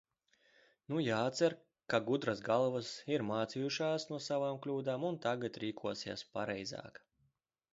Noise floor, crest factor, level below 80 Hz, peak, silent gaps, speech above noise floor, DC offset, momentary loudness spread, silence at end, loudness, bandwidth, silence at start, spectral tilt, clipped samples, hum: -80 dBFS; 22 dB; -76 dBFS; -16 dBFS; none; 43 dB; under 0.1%; 9 LU; 0.85 s; -37 LUFS; 7.6 kHz; 0.9 s; -4.5 dB/octave; under 0.1%; none